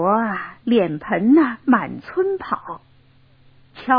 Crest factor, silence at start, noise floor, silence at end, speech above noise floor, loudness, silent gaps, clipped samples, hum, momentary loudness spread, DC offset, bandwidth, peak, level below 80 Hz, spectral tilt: 18 dB; 0 s; -52 dBFS; 0 s; 34 dB; -19 LUFS; none; under 0.1%; none; 13 LU; under 0.1%; 5.2 kHz; -2 dBFS; -58 dBFS; -10 dB/octave